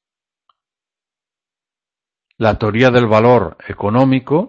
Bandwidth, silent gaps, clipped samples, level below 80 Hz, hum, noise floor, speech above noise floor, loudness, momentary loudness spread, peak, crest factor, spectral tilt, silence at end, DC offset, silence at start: 7.4 kHz; none; under 0.1%; -42 dBFS; none; -90 dBFS; 77 dB; -13 LUFS; 8 LU; 0 dBFS; 16 dB; -8 dB/octave; 0 s; under 0.1%; 2.4 s